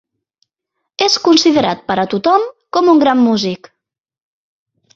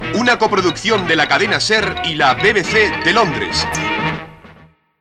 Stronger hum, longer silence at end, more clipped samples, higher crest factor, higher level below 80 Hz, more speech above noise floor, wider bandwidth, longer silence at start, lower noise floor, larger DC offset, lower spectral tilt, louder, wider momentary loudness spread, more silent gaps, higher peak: neither; first, 1.4 s vs 0.5 s; neither; about the same, 14 dB vs 16 dB; second, -58 dBFS vs -40 dBFS; first, 63 dB vs 31 dB; second, 7.8 kHz vs 13.5 kHz; first, 1 s vs 0 s; first, -75 dBFS vs -46 dBFS; neither; about the same, -4 dB/octave vs -3.5 dB/octave; about the same, -13 LUFS vs -14 LUFS; first, 9 LU vs 6 LU; neither; about the same, 0 dBFS vs 0 dBFS